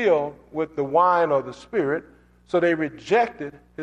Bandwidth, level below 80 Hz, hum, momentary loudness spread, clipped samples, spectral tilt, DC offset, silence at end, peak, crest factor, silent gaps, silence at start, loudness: 8.8 kHz; -60 dBFS; 60 Hz at -55 dBFS; 11 LU; under 0.1%; -6.5 dB/octave; under 0.1%; 0 s; -6 dBFS; 16 dB; none; 0 s; -23 LUFS